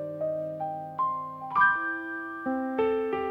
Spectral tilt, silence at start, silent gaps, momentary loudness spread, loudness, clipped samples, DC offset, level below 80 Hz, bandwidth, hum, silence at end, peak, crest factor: -7.5 dB/octave; 0 s; none; 11 LU; -29 LUFS; under 0.1%; under 0.1%; -66 dBFS; 5.4 kHz; none; 0 s; -10 dBFS; 18 dB